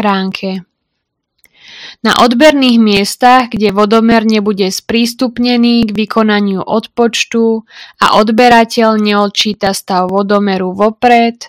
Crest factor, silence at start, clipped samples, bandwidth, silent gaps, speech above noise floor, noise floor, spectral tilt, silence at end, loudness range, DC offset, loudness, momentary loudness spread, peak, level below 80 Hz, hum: 10 dB; 0 s; 1%; 16 kHz; none; 61 dB; -71 dBFS; -4.5 dB/octave; 0 s; 3 LU; under 0.1%; -10 LUFS; 8 LU; 0 dBFS; -46 dBFS; none